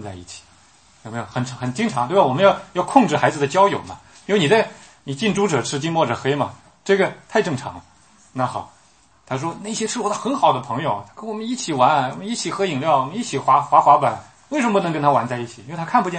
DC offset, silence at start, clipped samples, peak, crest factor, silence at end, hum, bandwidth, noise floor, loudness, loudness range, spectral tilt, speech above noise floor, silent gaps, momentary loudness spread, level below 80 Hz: under 0.1%; 0 s; under 0.1%; 0 dBFS; 20 dB; 0 s; none; 8.8 kHz; -55 dBFS; -20 LUFS; 6 LU; -5 dB/octave; 36 dB; none; 16 LU; -60 dBFS